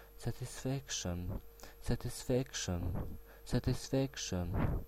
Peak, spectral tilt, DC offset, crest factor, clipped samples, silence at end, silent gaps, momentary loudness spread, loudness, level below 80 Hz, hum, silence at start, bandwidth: -20 dBFS; -5 dB/octave; under 0.1%; 18 dB; under 0.1%; 0 s; none; 11 LU; -39 LUFS; -46 dBFS; none; 0 s; 16 kHz